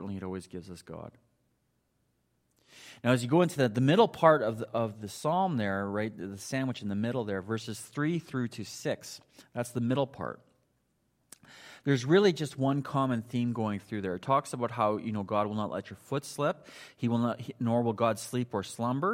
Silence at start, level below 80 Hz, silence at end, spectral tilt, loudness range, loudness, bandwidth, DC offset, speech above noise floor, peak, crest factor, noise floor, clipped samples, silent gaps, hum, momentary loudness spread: 0 s; -72 dBFS; 0 s; -6 dB/octave; 7 LU; -30 LUFS; 16 kHz; under 0.1%; 45 dB; -8 dBFS; 24 dB; -75 dBFS; under 0.1%; none; none; 16 LU